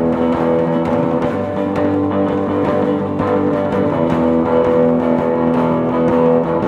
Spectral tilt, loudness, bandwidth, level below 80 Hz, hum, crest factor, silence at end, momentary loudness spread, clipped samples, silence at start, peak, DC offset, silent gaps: -9 dB/octave; -16 LUFS; 7.4 kHz; -42 dBFS; none; 12 dB; 0 s; 4 LU; under 0.1%; 0 s; -2 dBFS; under 0.1%; none